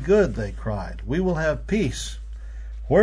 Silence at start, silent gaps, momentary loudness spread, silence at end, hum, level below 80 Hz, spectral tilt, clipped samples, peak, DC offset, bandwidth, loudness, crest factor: 0 s; none; 18 LU; 0 s; none; -34 dBFS; -6 dB/octave; under 0.1%; -6 dBFS; under 0.1%; 11 kHz; -25 LUFS; 16 dB